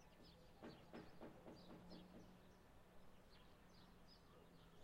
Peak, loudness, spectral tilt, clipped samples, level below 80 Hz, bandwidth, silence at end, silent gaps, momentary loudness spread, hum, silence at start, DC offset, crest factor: -46 dBFS; -65 LUFS; -5.5 dB/octave; under 0.1%; -74 dBFS; 16 kHz; 0 s; none; 8 LU; none; 0 s; under 0.1%; 16 dB